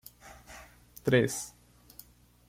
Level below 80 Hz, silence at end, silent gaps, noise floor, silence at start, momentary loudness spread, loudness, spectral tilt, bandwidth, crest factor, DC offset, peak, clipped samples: -60 dBFS; 1 s; none; -56 dBFS; 0.25 s; 25 LU; -29 LUFS; -5 dB/octave; 16.5 kHz; 24 dB; under 0.1%; -10 dBFS; under 0.1%